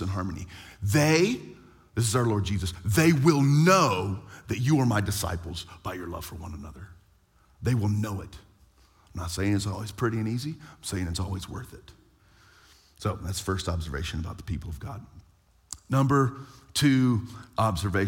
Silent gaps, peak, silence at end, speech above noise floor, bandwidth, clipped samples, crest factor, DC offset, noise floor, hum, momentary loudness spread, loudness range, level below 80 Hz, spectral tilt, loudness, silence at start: none; -6 dBFS; 0 s; 35 dB; 17 kHz; under 0.1%; 22 dB; under 0.1%; -62 dBFS; none; 19 LU; 11 LU; -50 dBFS; -5.5 dB/octave; -27 LUFS; 0 s